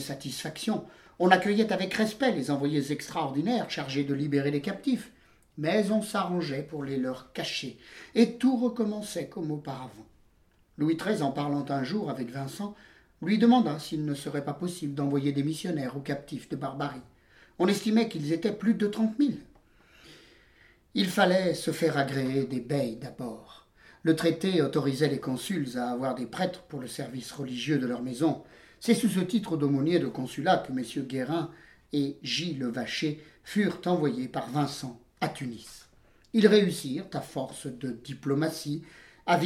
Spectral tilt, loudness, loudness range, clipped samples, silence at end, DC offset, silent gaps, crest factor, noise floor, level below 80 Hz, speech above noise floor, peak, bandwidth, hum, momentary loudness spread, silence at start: -5.5 dB/octave; -29 LUFS; 4 LU; under 0.1%; 0 s; under 0.1%; none; 24 dB; -64 dBFS; -66 dBFS; 35 dB; -6 dBFS; 16 kHz; none; 13 LU; 0 s